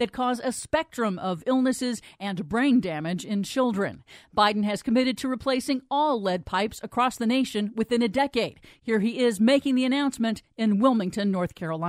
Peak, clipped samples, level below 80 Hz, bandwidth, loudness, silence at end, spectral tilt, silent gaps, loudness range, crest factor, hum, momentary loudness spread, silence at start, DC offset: -6 dBFS; under 0.1%; -58 dBFS; 15 kHz; -25 LUFS; 0 s; -5 dB/octave; none; 2 LU; 18 dB; none; 7 LU; 0 s; under 0.1%